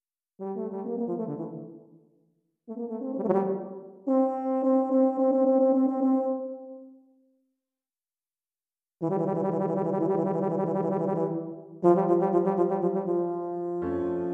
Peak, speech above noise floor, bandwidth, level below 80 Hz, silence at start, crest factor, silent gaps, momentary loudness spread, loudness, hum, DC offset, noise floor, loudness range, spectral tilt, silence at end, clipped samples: -10 dBFS; over 60 dB; 3 kHz; -70 dBFS; 0.4 s; 18 dB; none; 15 LU; -27 LUFS; none; under 0.1%; under -90 dBFS; 9 LU; -11.5 dB/octave; 0 s; under 0.1%